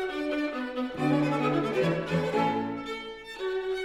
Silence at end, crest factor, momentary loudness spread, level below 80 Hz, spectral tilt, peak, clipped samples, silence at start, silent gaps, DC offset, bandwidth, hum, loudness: 0 s; 14 dB; 9 LU; -60 dBFS; -7 dB/octave; -14 dBFS; under 0.1%; 0 s; none; under 0.1%; 14 kHz; none; -29 LUFS